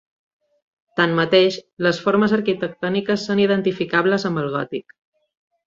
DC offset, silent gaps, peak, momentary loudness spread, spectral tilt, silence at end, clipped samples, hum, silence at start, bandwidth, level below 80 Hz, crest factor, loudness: under 0.1%; 1.73-1.77 s; -2 dBFS; 8 LU; -6 dB/octave; 0.85 s; under 0.1%; none; 0.95 s; 7.6 kHz; -62 dBFS; 18 dB; -20 LUFS